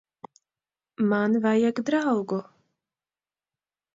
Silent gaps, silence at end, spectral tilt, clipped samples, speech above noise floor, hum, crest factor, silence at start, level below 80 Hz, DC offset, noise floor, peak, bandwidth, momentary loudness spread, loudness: none; 1.5 s; -7 dB/octave; under 0.1%; over 67 dB; none; 16 dB; 1 s; -74 dBFS; under 0.1%; under -90 dBFS; -12 dBFS; 7.6 kHz; 7 LU; -25 LUFS